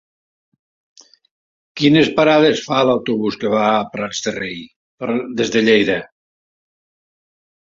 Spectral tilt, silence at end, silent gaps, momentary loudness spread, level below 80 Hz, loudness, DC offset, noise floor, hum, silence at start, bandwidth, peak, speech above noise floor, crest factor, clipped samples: -5 dB/octave; 1.7 s; 4.76-4.98 s; 12 LU; -56 dBFS; -16 LUFS; under 0.1%; under -90 dBFS; none; 1.75 s; 7.6 kHz; -2 dBFS; over 74 dB; 18 dB; under 0.1%